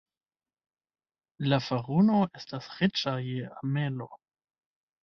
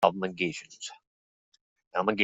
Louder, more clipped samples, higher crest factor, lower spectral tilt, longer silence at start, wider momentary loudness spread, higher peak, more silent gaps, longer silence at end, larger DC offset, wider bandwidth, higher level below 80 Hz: first, -29 LUFS vs -32 LUFS; neither; about the same, 20 dB vs 24 dB; first, -7 dB/octave vs -4.5 dB/octave; first, 1.4 s vs 0 s; about the same, 15 LU vs 14 LU; second, -10 dBFS vs -6 dBFS; second, none vs 1.07-1.52 s, 1.61-1.76 s, 1.87-1.91 s; first, 0.85 s vs 0 s; neither; second, 6.6 kHz vs 8.2 kHz; first, -66 dBFS vs -72 dBFS